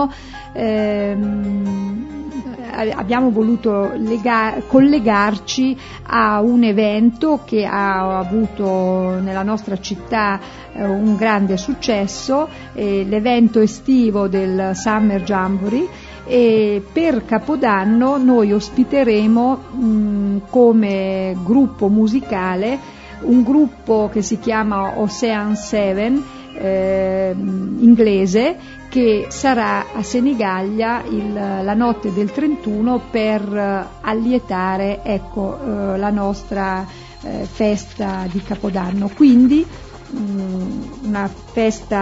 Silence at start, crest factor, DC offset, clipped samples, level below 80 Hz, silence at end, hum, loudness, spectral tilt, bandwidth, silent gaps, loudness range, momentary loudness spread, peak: 0 s; 16 dB; under 0.1%; under 0.1%; -42 dBFS; 0 s; none; -17 LUFS; -6.5 dB/octave; 8 kHz; none; 4 LU; 10 LU; -2 dBFS